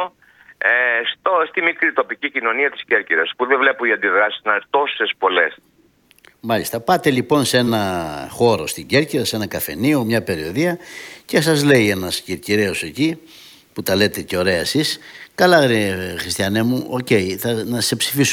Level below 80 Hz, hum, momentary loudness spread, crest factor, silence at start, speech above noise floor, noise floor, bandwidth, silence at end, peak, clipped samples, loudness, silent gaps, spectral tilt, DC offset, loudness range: -54 dBFS; none; 8 LU; 18 dB; 0 s; 37 dB; -55 dBFS; 18.5 kHz; 0 s; 0 dBFS; under 0.1%; -18 LUFS; none; -4 dB/octave; under 0.1%; 2 LU